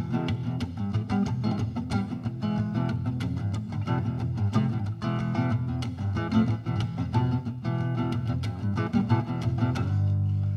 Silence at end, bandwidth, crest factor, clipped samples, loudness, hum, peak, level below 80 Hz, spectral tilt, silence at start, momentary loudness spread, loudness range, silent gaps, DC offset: 0 s; 9 kHz; 16 dB; under 0.1%; -28 LUFS; none; -10 dBFS; -48 dBFS; -8 dB/octave; 0 s; 5 LU; 2 LU; none; under 0.1%